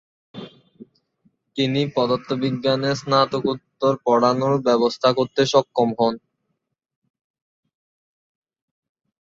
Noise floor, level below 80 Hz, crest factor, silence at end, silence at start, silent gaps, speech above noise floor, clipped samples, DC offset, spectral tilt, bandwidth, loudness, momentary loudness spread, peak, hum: -77 dBFS; -64 dBFS; 20 dB; 3.05 s; 0.35 s; none; 57 dB; under 0.1%; under 0.1%; -6 dB/octave; 7.8 kHz; -20 LUFS; 8 LU; -4 dBFS; none